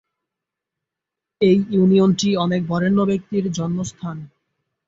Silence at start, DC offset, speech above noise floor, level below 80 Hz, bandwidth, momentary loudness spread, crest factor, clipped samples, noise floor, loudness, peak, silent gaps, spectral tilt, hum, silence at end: 1.4 s; under 0.1%; 67 dB; -56 dBFS; 7.8 kHz; 13 LU; 16 dB; under 0.1%; -85 dBFS; -19 LUFS; -4 dBFS; none; -6.5 dB/octave; none; 0.6 s